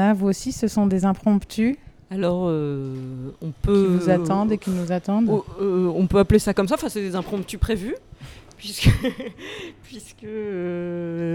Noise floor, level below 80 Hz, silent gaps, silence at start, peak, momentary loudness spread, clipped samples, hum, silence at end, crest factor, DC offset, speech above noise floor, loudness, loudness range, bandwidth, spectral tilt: -42 dBFS; -36 dBFS; none; 0 s; -4 dBFS; 16 LU; under 0.1%; none; 0 s; 18 dB; under 0.1%; 20 dB; -22 LUFS; 6 LU; 16.5 kHz; -6.5 dB/octave